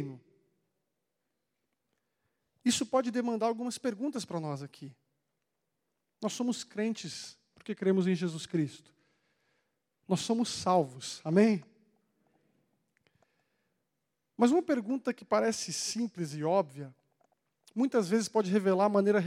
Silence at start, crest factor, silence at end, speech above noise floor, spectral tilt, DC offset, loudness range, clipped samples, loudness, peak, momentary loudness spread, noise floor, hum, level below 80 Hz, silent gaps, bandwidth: 0 s; 20 dB; 0 s; 54 dB; -5 dB/octave; under 0.1%; 6 LU; under 0.1%; -31 LUFS; -12 dBFS; 15 LU; -84 dBFS; none; -80 dBFS; none; 15 kHz